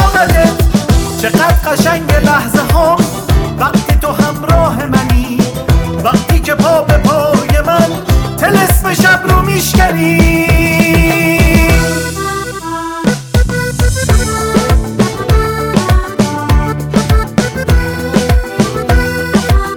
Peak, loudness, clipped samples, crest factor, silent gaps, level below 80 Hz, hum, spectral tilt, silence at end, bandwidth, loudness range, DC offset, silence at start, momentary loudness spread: 0 dBFS; -11 LUFS; under 0.1%; 10 dB; none; -16 dBFS; none; -5.5 dB/octave; 0 s; 19 kHz; 4 LU; 0.2%; 0 s; 5 LU